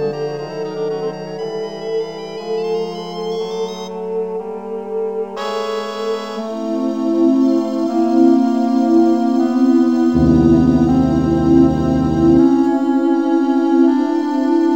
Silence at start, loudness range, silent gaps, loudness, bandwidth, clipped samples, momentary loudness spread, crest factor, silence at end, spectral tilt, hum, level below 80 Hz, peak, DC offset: 0 s; 10 LU; none; -16 LUFS; 8 kHz; under 0.1%; 12 LU; 16 dB; 0 s; -8 dB/octave; none; -36 dBFS; 0 dBFS; 0.4%